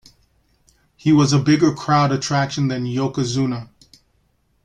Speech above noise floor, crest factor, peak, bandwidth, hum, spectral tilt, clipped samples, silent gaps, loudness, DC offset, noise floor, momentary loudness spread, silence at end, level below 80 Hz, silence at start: 46 dB; 16 dB; -4 dBFS; 9.6 kHz; none; -6 dB/octave; under 0.1%; none; -18 LUFS; under 0.1%; -63 dBFS; 8 LU; 1 s; -54 dBFS; 1.05 s